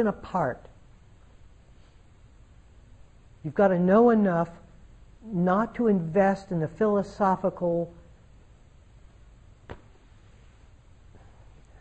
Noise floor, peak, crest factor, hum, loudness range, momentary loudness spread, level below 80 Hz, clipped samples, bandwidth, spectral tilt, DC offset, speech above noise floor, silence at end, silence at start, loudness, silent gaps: -54 dBFS; -10 dBFS; 18 dB; none; 13 LU; 20 LU; -54 dBFS; under 0.1%; 8.4 kHz; -9 dB/octave; under 0.1%; 30 dB; 2.05 s; 0 s; -25 LUFS; none